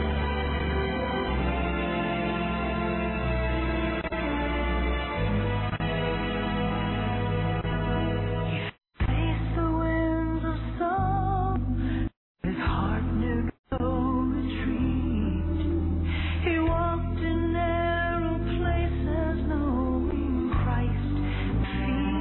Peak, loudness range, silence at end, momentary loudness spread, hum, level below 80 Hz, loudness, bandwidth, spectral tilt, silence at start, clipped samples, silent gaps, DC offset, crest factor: -14 dBFS; 1 LU; 0 s; 3 LU; none; -32 dBFS; -28 LUFS; 4.2 kHz; -11 dB/octave; 0 s; under 0.1%; 12.17-12.35 s, 13.59-13.64 s; under 0.1%; 12 dB